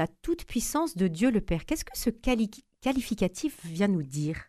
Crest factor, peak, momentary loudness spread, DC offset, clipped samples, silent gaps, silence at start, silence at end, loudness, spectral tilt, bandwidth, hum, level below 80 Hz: 16 dB; -12 dBFS; 7 LU; under 0.1%; under 0.1%; none; 0 s; 0.05 s; -29 LUFS; -5.5 dB/octave; 14.5 kHz; none; -44 dBFS